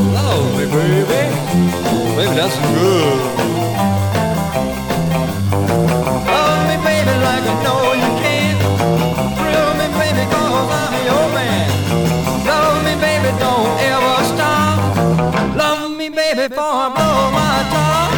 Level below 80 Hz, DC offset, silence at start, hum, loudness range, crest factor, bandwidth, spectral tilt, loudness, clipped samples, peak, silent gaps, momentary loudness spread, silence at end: -38 dBFS; under 0.1%; 0 s; none; 1 LU; 14 dB; 19.5 kHz; -5.5 dB/octave; -15 LUFS; under 0.1%; 0 dBFS; none; 4 LU; 0 s